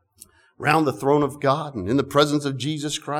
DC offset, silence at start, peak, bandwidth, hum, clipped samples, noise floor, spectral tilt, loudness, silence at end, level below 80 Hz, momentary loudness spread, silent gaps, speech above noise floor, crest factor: under 0.1%; 0.6 s; -4 dBFS; 16.5 kHz; none; under 0.1%; -52 dBFS; -5 dB/octave; -22 LUFS; 0 s; -58 dBFS; 7 LU; none; 30 dB; 18 dB